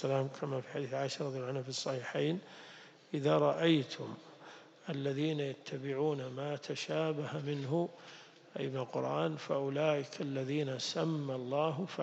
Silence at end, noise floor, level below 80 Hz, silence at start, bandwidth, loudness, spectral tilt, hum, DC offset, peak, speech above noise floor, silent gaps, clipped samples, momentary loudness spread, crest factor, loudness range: 0 s; -55 dBFS; -86 dBFS; 0 s; 8.4 kHz; -36 LUFS; -6 dB/octave; none; under 0.1%; -18 dBFS; 20 dB; none; under 0.1%; 17 LU; 18 dB; 3 LU